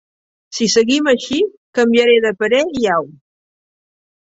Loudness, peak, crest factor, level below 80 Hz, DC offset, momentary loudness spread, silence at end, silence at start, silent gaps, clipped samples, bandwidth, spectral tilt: -15 LUFS; 0 dBFS; 16 dB; -58 dBFS; under 0.1%; 8 LU; 1.2 s; 0.5 s; 1.57-1.73 s; under 0.1%; 8 kHz; -3 dB/octave